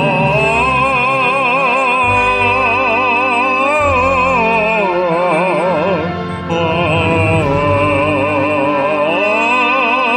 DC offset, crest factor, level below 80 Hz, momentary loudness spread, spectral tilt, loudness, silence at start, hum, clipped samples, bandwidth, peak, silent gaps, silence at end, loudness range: under 0.1%; 12 dB; -38 dBFS; 3 LU; -6 dB/octave; -12 LUFS; 0 s; none; under 0.1%; 11 kHz; -2 dBFS; none; 0 s; 2 LU